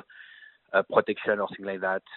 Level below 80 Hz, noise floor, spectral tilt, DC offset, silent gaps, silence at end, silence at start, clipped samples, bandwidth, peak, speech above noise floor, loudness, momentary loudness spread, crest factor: -72 dBFS; -52 dBFS; -2.5 dB/octave; under 0.1%; none; 0 s; 0.15 s; under 0.1%; 4.2 kHz; -6 dBFS; 25 dB; -27 LUFS; 16 LU; 24 dB